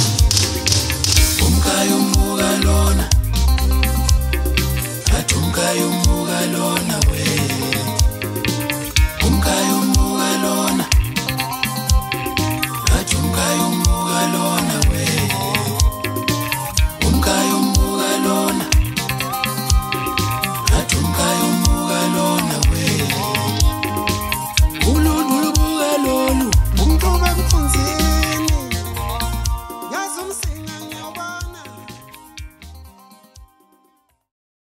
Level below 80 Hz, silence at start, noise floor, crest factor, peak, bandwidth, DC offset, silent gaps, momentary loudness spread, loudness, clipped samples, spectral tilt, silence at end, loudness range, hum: -22 dBFS; 0 s; -60 dBFS; 18 dB; 0 dBFS; 16.5 kHz; under 0.1%; none; 8 LU; -17 LUFS; under 0.1%; -4 dB/octave; 1.25 s; 7 LU; none